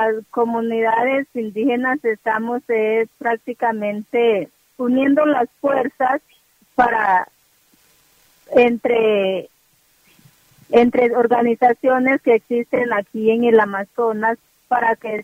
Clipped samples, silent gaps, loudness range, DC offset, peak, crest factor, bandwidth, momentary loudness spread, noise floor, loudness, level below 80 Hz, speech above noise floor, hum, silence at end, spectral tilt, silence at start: under 0.1%; none; 4 LU; under 0.1%; 0 dBFS; 18 dB; 15.5 kHz; 7 LU; -59 dBFS; -18 LUFS; -60 dBFS; 41 dB; none; 0 s; -6.5 dB/octave; 0 s